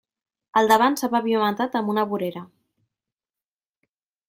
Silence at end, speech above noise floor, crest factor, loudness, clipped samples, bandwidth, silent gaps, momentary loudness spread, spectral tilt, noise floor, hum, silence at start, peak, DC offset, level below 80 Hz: 1.85 s; over 69 dB; 20 dB; -22 LUFS; under 0.1%; 16.5 kHz; none; 10 LU; -4.5 dB/octave; under -90 dBFS; none; 0.55 s; -4 dBFS; under 0.1%; -70 dBFS